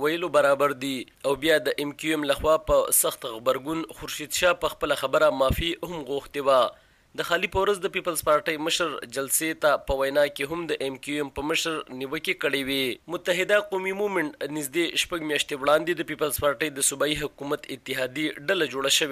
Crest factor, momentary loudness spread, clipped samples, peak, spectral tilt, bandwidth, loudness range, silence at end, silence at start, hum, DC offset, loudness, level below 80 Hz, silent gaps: 18 dB; 9 LU; under 0.1%; -8 dBFS; -2.5 dB/octave; 15.5 kHz; 3 LU; 0 s; 0 s; none; under 0.1%; -25 LUFS; -48 dBFS; none